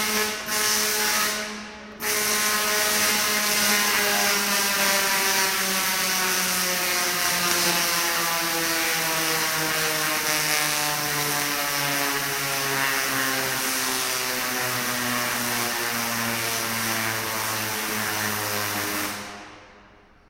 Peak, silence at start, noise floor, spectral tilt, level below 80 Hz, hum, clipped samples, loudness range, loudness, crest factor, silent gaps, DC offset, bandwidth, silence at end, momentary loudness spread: -2 dBFS; 0 s; -52 dBFS; -1 dB/octave; -58 dBFS; none; under 0.1%; 5 LU; -22 LUFS; 22 dB; none; under 0.1%; 16 kHz; 0.5 s; 5 LU